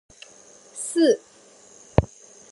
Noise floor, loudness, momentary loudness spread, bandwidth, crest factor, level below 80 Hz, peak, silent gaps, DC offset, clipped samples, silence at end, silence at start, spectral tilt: -51 dBFS; -23 LUFS; 23 LU; 11.5 kHz; 26 dB; -40 dBFS; 0 dBFS; none; under 0.1%; under 0.1%; 0.45 s; 0.75 s; -5.5 dB/octave